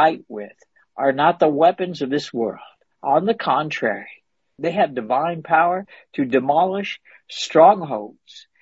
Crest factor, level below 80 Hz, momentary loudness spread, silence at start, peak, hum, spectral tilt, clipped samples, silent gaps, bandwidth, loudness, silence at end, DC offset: 18 dB; -68 dBFS; 18 LU; 0 s; -2 dBFS; none; -5.5 dB/octave; under 0.1%; none; 8 kHz; -20 LUFS; 0.2 s; under 0.1%